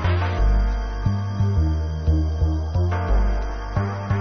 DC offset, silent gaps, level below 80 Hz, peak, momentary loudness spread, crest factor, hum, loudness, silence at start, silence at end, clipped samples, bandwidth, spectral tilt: under 0.1%; none; -24 dBFS; -8 dBFS; 4 LU; 12 dB; none; -23 LUFS; 0 s; 0 s; under 0.1%; 6.4 kHz; -8 dB/octave